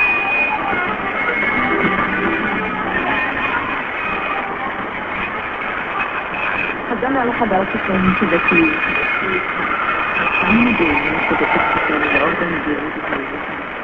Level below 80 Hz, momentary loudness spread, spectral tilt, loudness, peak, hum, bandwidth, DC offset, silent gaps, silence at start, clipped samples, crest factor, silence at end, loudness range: -42 dBFS; 8 LU; -7.5 dB/octave; -17 LUFS; -2 dBFS; none; 7.2 kHz; under 0.1%; none; 0 s; under 0.1%; 16 dB; 0 s; 5 LU